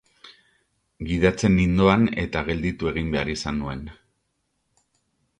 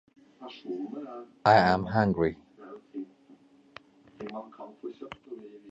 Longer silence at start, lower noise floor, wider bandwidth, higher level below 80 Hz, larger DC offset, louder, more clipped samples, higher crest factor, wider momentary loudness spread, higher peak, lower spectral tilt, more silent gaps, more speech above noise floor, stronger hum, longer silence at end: second, 0.25 s vs 0.4 s; first, -74 dBFS vs -58 dBFS; first, 9.8 kHz vs 8 kHz; first, -40 dBFS vs -58 dBFS; neither; first, -22 LUFS vs -26 LUFS; neither; about the same, 22 dB vs 24 dB; second, 14 LU vs 25 LU; first, -4 dBFS vs -8 dBFS; about the same, -6.5 dB/octave vs -7.5 dB/octave; neither; first, 52 dB vs 29 dB; neither; first, 1.45 s vs 0 s